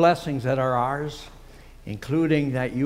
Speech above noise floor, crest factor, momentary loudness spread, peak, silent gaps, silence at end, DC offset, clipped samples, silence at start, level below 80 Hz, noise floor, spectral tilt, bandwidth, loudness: 22 dB; 18 dB; 18 LU; -6 dBFS; none; 0 s; under 0.1%; under 0.1%; 0 s; -48 dBFS; -45 dBFS; -7 dB/octave; 15.5 kHz; -24 LUFS